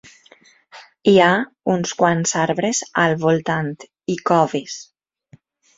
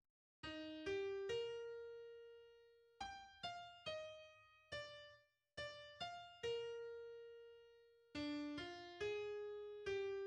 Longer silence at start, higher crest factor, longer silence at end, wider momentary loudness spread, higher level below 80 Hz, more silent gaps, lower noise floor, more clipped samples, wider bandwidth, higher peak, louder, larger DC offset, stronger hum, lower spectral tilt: first, 0.75 s vs 0.45 s; about the same, 18 dB vs 16 dB; first, 0.95 s vs 0 s; second, 13 LU vs 17 LU; first, -60 dBFS vs -76 dBFS; neither; second, -52 dBFS vs -70 dBFS; neither; second, 8 kHz vs 10 kHz; first, 0 dBFS vs -34 dBFS; first, -18 LUFS vs -50 LUFS; neither; neither; about the same, -4.5 dB/octave vs -4 dB/octave